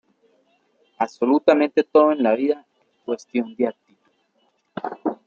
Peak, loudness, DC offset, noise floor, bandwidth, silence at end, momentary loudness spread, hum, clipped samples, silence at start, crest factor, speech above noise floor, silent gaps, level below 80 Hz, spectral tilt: 0 dBFS; -21 LUFS; under 0.1%; -67 dBFS; 7.2 kHz; 0.15 s; 15 LU; none; under 0.1%; 1 s; 22 dB; 48 dB; none; -74 dBFS; -6 dB/octave